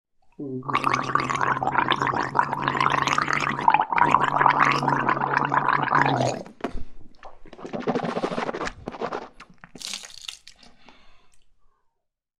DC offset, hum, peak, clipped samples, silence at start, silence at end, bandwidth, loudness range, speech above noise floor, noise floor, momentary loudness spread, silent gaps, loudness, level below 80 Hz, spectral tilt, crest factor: under 0.1%; none; 0 dBFS; under 0.1%; 0.4 s; 1 s; 13.5 kHz; 14 LU; 54 dB; -78 dBFS; 16 LU; none; -23 LUFS; -50 dBFS; -4.5 dB/octave; 24 dB